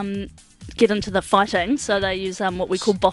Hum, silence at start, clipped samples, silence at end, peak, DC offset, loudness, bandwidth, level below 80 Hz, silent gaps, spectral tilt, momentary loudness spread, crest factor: none; 0 s; under 0.1%; 0 s; -2 dBFS; under 0.1%; -21 LUFS; 11.5 kHz; -44 dBFS; none; -4.5 dB/octave; 11 LU; 18 dB